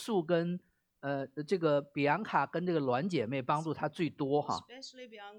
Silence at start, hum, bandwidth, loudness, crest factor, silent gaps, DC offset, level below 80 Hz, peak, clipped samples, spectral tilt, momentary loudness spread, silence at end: 0 s; none; 16 kHz; -33 LUFS; 20 dB; none; under 0.1%; -78 dBFS; -14 dBFS; under 0.1%; -6.5 dB/octave; 12 LU; 0 s